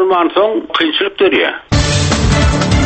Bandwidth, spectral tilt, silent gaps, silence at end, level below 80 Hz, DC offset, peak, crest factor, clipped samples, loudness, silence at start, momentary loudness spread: 8.8 kHz; -5 dB/octave; none; 0 s; -22 dBFS; under 0.1%; 0 dBFS; 12 dB; under 0.1%; -13 LUFS; 0 s; 3 LU